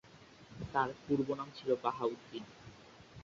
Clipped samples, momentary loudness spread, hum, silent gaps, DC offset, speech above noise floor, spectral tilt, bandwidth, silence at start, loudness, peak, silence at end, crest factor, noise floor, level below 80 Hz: under 0.1%; 21 LU; none; none; under 0.1%; 22 dB; -5 dB/octave; 7.6 kHz; 0.05 s; -37 LUFS; -18 dBFS; 0 s; 20 dB; -58 dBFS; -66 dBFS